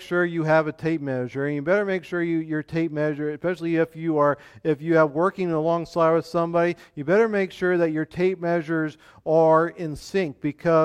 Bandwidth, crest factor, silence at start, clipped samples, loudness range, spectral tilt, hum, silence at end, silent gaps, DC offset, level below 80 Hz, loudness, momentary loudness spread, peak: 11.5 kHz; 16 dB; 0 s; under 0.1%; 3 LU; -7.5 dB/octave; none; 0 s; none; under 0.1%; -60 dBFS; -23 LUFS; 7 LU; -6 dBFS